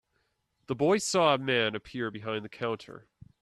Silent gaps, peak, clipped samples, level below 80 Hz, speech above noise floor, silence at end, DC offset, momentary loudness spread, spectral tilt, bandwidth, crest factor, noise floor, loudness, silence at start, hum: none; -10 dBFS; under 0.1%; -66 dBFS; 47 dB; 0.45 s; under 0.1%; 13 LU; -4 dB/octave; 13.5 kHz; 20 dB; -76 dBFS; -29 LUFS; 0.7 s; none